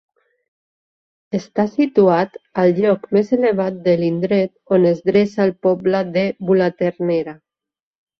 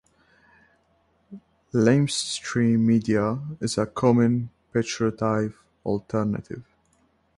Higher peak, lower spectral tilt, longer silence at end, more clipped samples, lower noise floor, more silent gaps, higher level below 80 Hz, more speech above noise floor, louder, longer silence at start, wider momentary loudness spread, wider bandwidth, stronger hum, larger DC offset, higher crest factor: first, -2 dBFS vs -6 dBFS; first, -8 dB/octave vs -6 dB/octave; about the same, 0.85 s vs 0.75 s; neither; first, under -90 dBFS vs -66 dBFS; neither; about the same, -60 dBFS vs -56 dBFS; first, over 73 dB vs 43 dB; first, -17 LUFS vs -24 LUFS; about the same, 1.35 s vs 1.3 s; second, 6 LU vs 10 LU; second, 6.4 kHz vs 11.5 kHz; neither; neither; about the same, 16 dB vs 18 dB